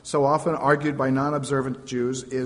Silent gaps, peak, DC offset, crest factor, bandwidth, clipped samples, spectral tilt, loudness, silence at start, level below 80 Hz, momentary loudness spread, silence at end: none; -6 dBFS; under 0.1%; 18 dB; 10.5 kHz; under 0.1%; -6 dB/octave; -24 LUFS; 0.05 s; -58 dBFS; 6 LU; 0 s